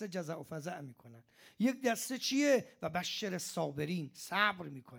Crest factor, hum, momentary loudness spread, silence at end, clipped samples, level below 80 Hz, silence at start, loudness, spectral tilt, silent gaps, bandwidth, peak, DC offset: 22 dB; none; 12 LU; 0 s; under 0.1%; -78 dBFS; 0 s; -35 LUFS; -4 dB/octave; none; 18 kHz; -14 dBFS; under 0.1%